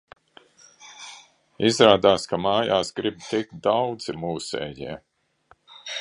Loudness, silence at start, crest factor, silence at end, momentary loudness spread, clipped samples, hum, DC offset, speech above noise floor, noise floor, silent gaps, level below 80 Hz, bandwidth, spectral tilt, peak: -22 LUFS; 0.8 s; 24 dB; 0 s; 24 LU; under 0.1%; none; under 0.1%; 38 dB; -60 dBFS; none; -58 dBFS; 11 kHz; -4.5 dB/octave; 0 dBFS